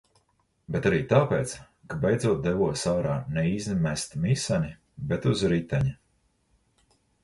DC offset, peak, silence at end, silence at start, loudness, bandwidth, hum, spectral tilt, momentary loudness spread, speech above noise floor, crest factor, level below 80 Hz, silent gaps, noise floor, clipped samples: under 0.1%; -8 dBFS; 1.3 s; 0.7 s; -27 LUFS; 11.5 kHz; none; -6 dB/octave; 10 LU; 45 dB; 20 dB; -50 dBFS; none; -70 dBFS; under 0.1%